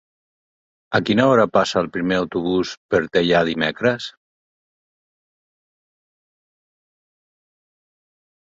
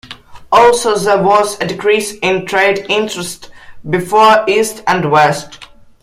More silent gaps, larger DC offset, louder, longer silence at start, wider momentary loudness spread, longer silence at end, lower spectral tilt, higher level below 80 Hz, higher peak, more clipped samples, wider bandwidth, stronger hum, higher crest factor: first, 2.77-2.89 s vs none; neither; second, -19 LUFS vs -12 LUFS; first, 0.9 s vs 0.05 s; second, 7 LU vs 14 LU; first, 4.35 s vs 0.35 s; first, -5.5 dB/octave vs -4 dB/octave; second, -54 dBFS vs -48 dBFS; about the same, -2 dBFS vs 0 dBFS; neither; second, 8 kHz vs 16 kHz; neither; first, 20 dB vs 12 dB